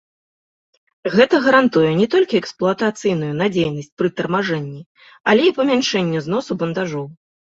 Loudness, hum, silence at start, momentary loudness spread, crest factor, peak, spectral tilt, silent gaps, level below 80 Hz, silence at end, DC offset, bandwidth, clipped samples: -18 LUFS; none; 1.05 s; 11 LU; 18 dB; -2 dBFS; -5.5 dB/octave; 3.92-3.97 s, 4.86-4.95 s, 5.20-5.24 s; -58 dBFS; 0.35 s; under 0.1%; 8 kHz; under 0.1%